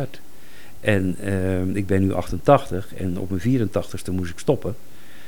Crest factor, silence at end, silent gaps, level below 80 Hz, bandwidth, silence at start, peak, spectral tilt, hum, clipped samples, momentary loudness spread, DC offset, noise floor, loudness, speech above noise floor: 22 dB; 0.05 s; none; -46 dBFS; 19.5 kHz; 0 s; -2 dBFS; -7 dB/octave; none; under 0.1%; 11 LU; 4%; -47 dBFS; -23 LUFS; 25 dB